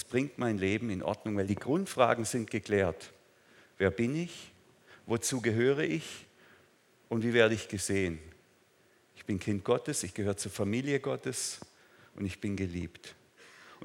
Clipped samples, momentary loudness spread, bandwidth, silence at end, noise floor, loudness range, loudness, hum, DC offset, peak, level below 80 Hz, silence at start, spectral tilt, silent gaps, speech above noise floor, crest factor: under 0.1%; 17 LU; 17 kHz; 0 s; -66 dBFS; 3 LU; -32 LUFS; none; under 0.1%; -10 dBFS; -68 dBFS; 0 s; -5 dB/octave; none; 34 dB; 24 dB